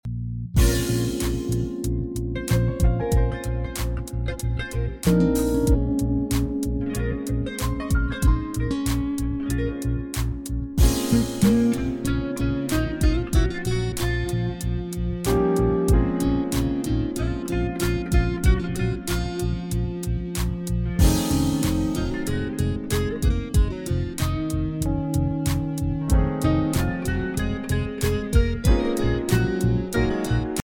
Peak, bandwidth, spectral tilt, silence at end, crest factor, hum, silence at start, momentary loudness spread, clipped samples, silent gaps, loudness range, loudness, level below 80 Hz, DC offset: -6 dBFS; 17.5 kHz; -6 dB/octave; 0 s; 16 dB; none; 0.05 s; 7 LU; under 0.1%; none; 2 LU; -24 LUFS; -28 dBFS; under 0.1%